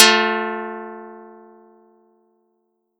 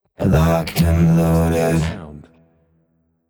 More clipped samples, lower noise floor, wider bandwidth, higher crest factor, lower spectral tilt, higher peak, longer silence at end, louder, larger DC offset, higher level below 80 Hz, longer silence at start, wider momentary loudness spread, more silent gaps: neither; first, -70 dBFS vs -63 dBFS; second, 18 kHz vs over 20 kHz; first, 22 dB vs 14 dB; second, -0.5 dB/octave vs -7 dB/octave; first, 0 dBFS vs -4 dBFS; first, 1.75 s vs 1.1 s; about the same, -19 LUFS vs -17 LUFS; neither; second, -88 dBFS vs -32 dBFS; second, 0 s vs 0.2 s; first, 25 LU vs 11 LU; neither